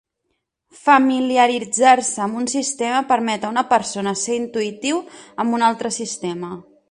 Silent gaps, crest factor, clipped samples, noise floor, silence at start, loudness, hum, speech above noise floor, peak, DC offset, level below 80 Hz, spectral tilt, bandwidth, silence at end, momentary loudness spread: none; 18 dB; under 0.1%; -74 dBFS; 0.85 s; -19 LUFS; none; 55 dB; 0 dBFS; under 0.1%; -64 dBFS; -3 dB/octave; 11 kHz; 0.3 s; 12 LU